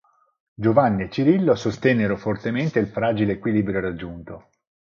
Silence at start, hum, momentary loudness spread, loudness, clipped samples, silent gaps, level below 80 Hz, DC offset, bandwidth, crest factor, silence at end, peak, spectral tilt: 0.6 s; none; 15 LU; -21 LUFS; under 0.1%; none; -50 dBFS; under 0.1%; 7.2 kHz; 20 dB; 0.55 s; -2 dBFS; -8 dB/octave